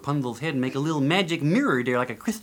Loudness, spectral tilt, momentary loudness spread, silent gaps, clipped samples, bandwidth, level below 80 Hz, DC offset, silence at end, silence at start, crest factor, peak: -24 LUFS; -6 dB/octave; 6 LU; none; under 0.1%; 18.5 kHz; -64 dBFS; under 0.1%; 0 s; 0 s; 16 dB; -8 dBFS